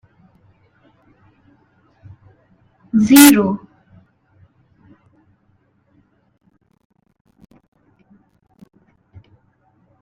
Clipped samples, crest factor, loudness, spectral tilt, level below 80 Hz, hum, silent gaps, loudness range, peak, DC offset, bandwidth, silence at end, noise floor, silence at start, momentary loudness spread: under 0.1%; 22 dB; -11 LUFS; -3.5 dB/octave; -56 dBFS; none; none; 10 LU; 0 dBFS; under 0.1%; 16.5 kHz; 6.45 s; -60 dBFS; 2.95 s; 15 LU